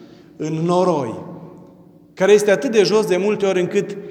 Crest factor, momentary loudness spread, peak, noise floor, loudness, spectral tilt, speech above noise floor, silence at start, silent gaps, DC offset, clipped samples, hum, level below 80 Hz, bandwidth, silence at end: 16 dB; 15 LU; -2 dBFS; -46 dBFS; -17 LUFS; -5.5 dB/octave; 29 dB; 0 s; none; under 0.1%; under 0.1%; none; -68 dBFS; 14.5 kHz; 0 s